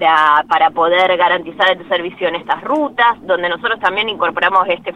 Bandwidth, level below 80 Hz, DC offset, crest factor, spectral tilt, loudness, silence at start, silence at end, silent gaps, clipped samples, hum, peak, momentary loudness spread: 9.4 kHz; -56 dBFS; under 0.1%; 14 dB; -4.5 dB/octave; -14 LUFS; 0 s; 0 s; none; under 0.1%; none; 0 dBFS; 6 LU